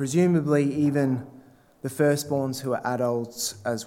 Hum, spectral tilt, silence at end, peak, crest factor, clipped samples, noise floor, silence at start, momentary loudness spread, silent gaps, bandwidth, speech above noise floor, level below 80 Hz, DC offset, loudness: none; -6 dB/octave; 0 s; -10 dBFS; 14 dB; under 0.1%; -45 dBFS; 0 s; 8 LU; none; 16.5 kHz; 20 dB; -68 dBFS; under 0.1%; -25 LUFS